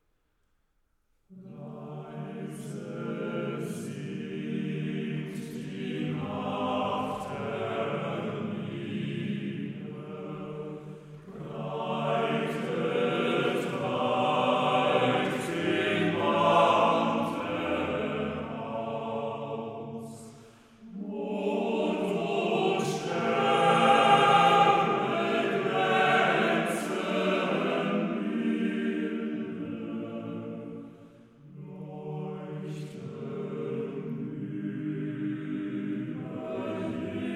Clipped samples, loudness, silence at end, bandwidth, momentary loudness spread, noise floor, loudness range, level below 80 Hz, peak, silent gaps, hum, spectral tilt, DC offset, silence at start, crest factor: under 0.1%; -29 LUFS; 0 s; 14.5 kHz; 17 LU; -72 dBFS; 14 LU; -68 dBFS; -10 dBFS; none; none; -6 dB/octave; under 0.1%; 1.3 s; 20 dB